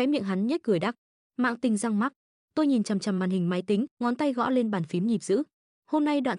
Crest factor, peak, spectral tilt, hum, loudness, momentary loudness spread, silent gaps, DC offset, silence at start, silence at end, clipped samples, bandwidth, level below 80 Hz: 14 dB; -14 dBFS; -6 dB/octave; none; -27 LUFS; 6 LU; 0.98-1.30 s, 2.16-2.48 s, 3.91-3.97 s, 5.53-5.82 s; under 0.1%; 0 s; 0 s; under 0.1%; 11 kHz; -74 dBFS